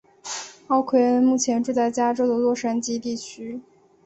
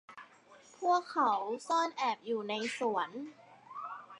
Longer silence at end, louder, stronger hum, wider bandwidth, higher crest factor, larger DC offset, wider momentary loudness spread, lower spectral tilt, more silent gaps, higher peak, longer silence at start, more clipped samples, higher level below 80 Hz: first, 0.45 s vs 0 s; first, -22 LUFS vs -34 LUFS; neither; second, 8.2 kHz vs 11 kHz; about the same, 16 dB vs 18 dB; neither; about the same, 15 LU vs 17 LU; about the same, -3.5 dB/octave vs -3 dB/octave; neither; first, -8 dBFS vs -18 dBFS; first, 0.25 s vs 0.1 s; neither; first, -66 dBFS vs under -90 dBFS